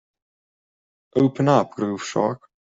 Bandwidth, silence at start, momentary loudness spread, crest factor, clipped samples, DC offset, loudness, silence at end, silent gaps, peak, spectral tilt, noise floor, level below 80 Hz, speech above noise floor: 7.8 kHz; 1.15 s; 9 LU; 20 dB; under 0.1%; under 0.1%; -22 LUFS; 0.4 s; none; -2 dBFS; -6.5 dB/octave; under -90 dBFS; -62 dBFS; over 70 dB